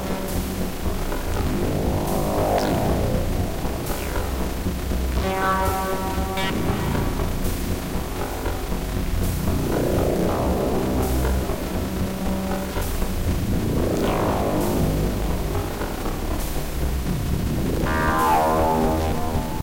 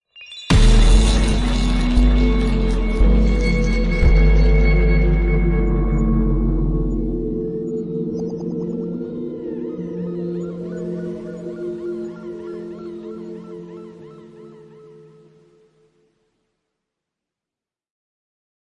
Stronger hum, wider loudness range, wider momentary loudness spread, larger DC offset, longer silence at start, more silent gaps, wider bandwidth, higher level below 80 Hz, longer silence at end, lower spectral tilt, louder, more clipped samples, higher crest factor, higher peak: neither; second, 3 LU vs 17 LU; second, 6 LU vs 17 LU; first, 1% vs under 0.1%; second, 0 s vs 0.15 s; neither; first, 17 kHz vs 11 kHz; second, -28 dBFS vs -20 dBFS; second, 0 s vs 4.1 s; about the same, -6 dB/octave vs -6.5 dB/octave; second, -24 LUFS vs -20 LUFS; neither; about the same, 14 dB vs 16 dB; second, -8 dBFS vs -2 dBFS